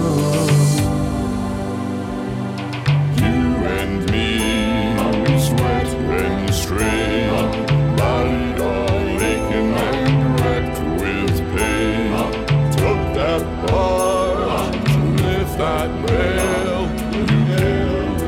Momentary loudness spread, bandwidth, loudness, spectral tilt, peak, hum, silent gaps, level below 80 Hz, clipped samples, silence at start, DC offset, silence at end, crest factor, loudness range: 5 LU; 17.5 kHz; -18 LUFS; -6 dB/octave; -4 dBFS; none; none; -30 dBFS; under 0.1%; 0 s; under 0.1%; 0 s; 14 dB; 1 LU